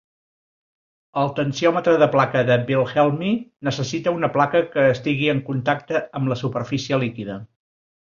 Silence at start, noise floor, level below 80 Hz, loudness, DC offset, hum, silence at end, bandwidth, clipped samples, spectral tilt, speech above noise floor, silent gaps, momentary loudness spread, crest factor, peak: 1.15 s; under -90 dBFS; -58 dBFS; -21 LUFS; under 0.1%; none; 0.55 s; 7.4 kHz; under 0.1%; -6.5 dB/octave; over 70 dB; none; 8 LU; 18 dB; -2 dBFS